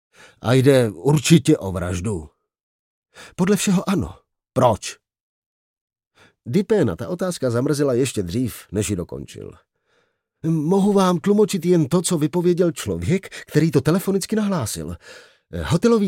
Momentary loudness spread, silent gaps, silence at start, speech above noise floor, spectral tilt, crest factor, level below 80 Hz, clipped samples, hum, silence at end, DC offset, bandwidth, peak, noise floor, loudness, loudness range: 14 LU; 2.63-3.02 s, 5.21-5.74 s, 5.81-5.88 s, 6.07-6.11 s; 0.45 s; 47 dB; -6 dB/octave; 20 dB; -50 dBFS; under 0.1%; none; 0 s; under 0.1%; 16.5 kHz; -2 dBFS; -66 dBFS; -20 LUFS; 5 LU